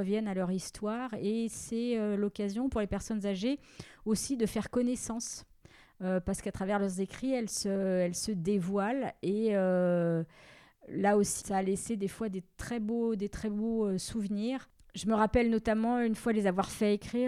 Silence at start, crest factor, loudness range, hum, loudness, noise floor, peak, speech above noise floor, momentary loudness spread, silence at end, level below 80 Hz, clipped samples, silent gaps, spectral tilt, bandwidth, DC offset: 0 s; 16 dB; 3 LU; none; -32 LUFS; -59 dBFS; -16 dBFS; 28 dB; 8 LU; 0 s; -54 dBFS; under 0.1%; none; -5.5 dB/octave; 15 kHz; under 0.1%